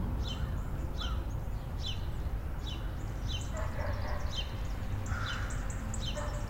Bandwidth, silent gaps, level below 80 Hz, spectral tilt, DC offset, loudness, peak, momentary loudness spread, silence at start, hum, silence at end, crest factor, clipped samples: 16 kHz; none; -38 dBFS; -5 dB/octave; under 0.1%; -38 LUFS; -22 dBFS; 3 LU; 0 s; none; 0 s; 14 dB; under 0.1%